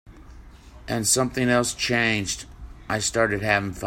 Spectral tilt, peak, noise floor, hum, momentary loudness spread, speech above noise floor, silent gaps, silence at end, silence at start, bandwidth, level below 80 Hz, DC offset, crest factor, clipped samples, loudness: -3 dB/octave; -6 dBFS; -45 dBFS; none; 12 LU; 22 dB; none; 0 s; 0.05 s; 16.5 kHz; -46 dBFS; under 0.1%; 20 dB; under 0.1%; -23 LUFS